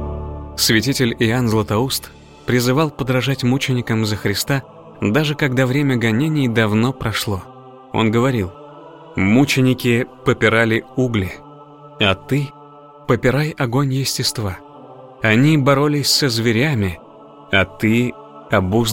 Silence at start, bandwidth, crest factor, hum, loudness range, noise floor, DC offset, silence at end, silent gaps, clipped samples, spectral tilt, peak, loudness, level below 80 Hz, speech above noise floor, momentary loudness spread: 0 s; 17 kHz; 16 dB; none; 3 LU; -41 dBFS; under 0.1%; 0 s; none; under 0.1%; -5 dB/octave; -2 dBFS; -17 LUFS; -42 dBFS; 25 dB; 10 LU